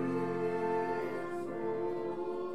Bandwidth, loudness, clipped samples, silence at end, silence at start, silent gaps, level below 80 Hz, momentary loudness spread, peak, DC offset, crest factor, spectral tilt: 12 kHz; -36 LUFS; under 0.1%; 0 s; 0 s; none; -78 dBFS; 4 LU; -22 dBFS; 0.4%; 12 dB; -7.5 dB/octave